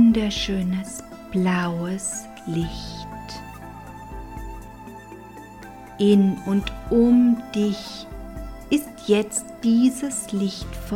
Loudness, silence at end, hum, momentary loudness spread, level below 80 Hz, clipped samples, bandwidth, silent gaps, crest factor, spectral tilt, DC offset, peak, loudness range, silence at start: -22 LUFS; 0 s; none; 22 LU; -42 dBFS; under 0.1%; 16 kHz; none; 18 dB; -5.5 dB/octave; under 0.1%; -6 dBFS; 12 LU; 0 s